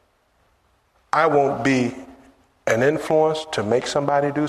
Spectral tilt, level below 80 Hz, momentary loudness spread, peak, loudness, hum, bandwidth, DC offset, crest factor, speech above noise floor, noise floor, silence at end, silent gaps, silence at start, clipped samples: -5.5 dB/octave; -58 dBFS; 7 LU; -4 dBFS; -20 LUFS; none; 13.5 kHz; under 0.1%; 18 dB; 43 dB; -63 dBFS; 0 s; none; 1.15 s; under 0.1%